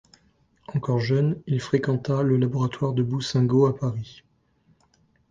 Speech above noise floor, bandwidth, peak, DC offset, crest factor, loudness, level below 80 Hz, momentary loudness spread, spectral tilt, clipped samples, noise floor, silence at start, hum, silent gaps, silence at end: 41 dB; 7.6 kHz; -8 dBFS; under 0.1%; 18 dB; -24 LUFS; -58 dBFS; 9 LU; -7.5 dB/octave; under 0.1%; -64 dBFS; 0.7 s; none; none; 1.2 s